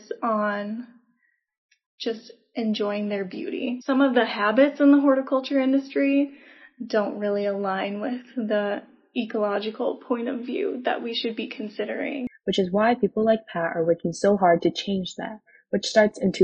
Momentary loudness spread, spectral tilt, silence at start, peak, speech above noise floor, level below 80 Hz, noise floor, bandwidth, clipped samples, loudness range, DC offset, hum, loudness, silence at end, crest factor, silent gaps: 12 LU; -5.5 dB/octave; 0.1 s; -4 dBFS; 46 dB; -66 dBFS; -69 dBFS; 8.4 kHz; under 0.1%; 7 LU; under 0.1%; none; -24 LUFS; 0 s; 20 dB; 1.58-1.69 s, 1.86-1.98 s